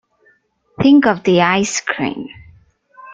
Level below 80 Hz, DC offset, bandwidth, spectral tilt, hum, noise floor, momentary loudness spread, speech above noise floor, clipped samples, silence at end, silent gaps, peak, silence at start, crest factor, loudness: -52 dBFS; under 0.1%; 9.2 kHz; -4.5 dB/octave; none; -57 dBFS; 14 LU; 43 dB; under 0.1%; 0 s; none; -2 dBFS; 0.8 s; 16 dB; -14 LUFS